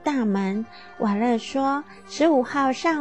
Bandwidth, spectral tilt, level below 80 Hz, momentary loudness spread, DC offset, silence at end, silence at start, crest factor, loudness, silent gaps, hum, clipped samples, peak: 8.6 kHz; -5.5 dB/octave; -62 dBFS; 10 LU; 0.3%; 0 s; 0.05 s; 16 dB; -23 LUFS; none; none; under 0.1%; -6 dBFS